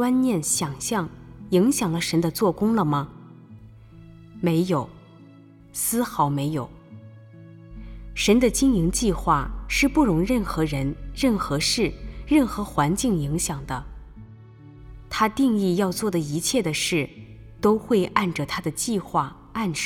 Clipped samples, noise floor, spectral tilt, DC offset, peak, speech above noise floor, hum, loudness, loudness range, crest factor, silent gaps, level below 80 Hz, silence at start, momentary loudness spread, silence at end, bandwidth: under 0.1%; -48 dBFS; -4.5 dB/octave; under 0.1%; -2 dBFS; 26 dB; none; -23 LUFS; 5 LU; 22 dB; none; -40 dBFS; 0 s; 13 LU; 0 s; 19.5 kHz